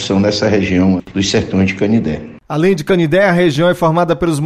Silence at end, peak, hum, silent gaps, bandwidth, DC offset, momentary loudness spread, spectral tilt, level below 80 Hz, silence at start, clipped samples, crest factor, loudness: 0 s; -2 dBFS; none; none; 13.5 kHz; under 0.1%; 5 LU; -6 dB/octave; -40 dBFS; 0 s; under 0.1%; 10 dB; -13 LUFS